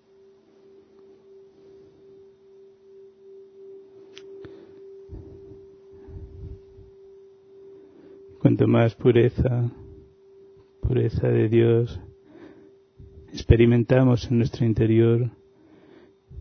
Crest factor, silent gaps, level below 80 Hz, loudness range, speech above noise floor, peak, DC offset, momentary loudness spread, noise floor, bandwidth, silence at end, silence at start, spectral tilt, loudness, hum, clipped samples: 24 dB; none; -40 dBFS; 23 LU; 35 dB; -2 dBFS; under 0.1%; 27 LU; -55 dBFS; 6.4 kHz; 0 s; 3.65 s; -9 dB/octave; -21 LUFS; none; under 0.1%